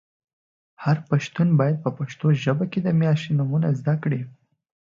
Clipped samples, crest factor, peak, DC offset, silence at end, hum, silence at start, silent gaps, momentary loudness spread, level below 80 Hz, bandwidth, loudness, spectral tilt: under 0.1%; 16 dB; -6 dBFS; under 0.1%; 0.7 s; none; 0.8 s; none; 7 LU; -64 dBFS; 7.2 kHz; -23 LUFS; -8 dB/octave